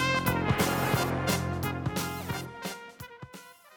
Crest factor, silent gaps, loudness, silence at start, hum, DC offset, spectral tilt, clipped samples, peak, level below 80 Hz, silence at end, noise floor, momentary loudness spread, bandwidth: 18 dB; none; -30 LUFS; 0 s; none; under 0.1%; -4.5 dB/octave; under 0.1%; -12 dBFS; -52 dBFS; 0 s; -50 dBFS; 19 LU; over 20 kHz